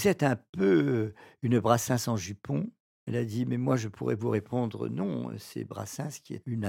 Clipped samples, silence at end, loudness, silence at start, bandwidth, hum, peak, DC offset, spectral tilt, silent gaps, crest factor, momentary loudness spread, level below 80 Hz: under 0.1%; 0 s; -30 LUFS; 0 s; 17 kHz; none; -8 dBFS; under 0.1%; -6 dB/octave; 0.49-0.53 s, 2.80-3.07 s; 22 dB; 13 LU; -66 dBFS